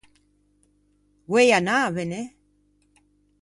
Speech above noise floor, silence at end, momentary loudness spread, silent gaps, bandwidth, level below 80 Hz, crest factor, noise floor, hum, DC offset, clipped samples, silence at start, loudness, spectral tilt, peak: 44 dB; 1.15 s; 16 LU; none; 11.5 kHz; -64 dBFS; 20 dB; -64 dBFS; 50 Hz at -55 dBFS; under 0.1%; under 0.1%; 1.3 s; -21 LUFS; -4.5 dB/octave; -6 dBFS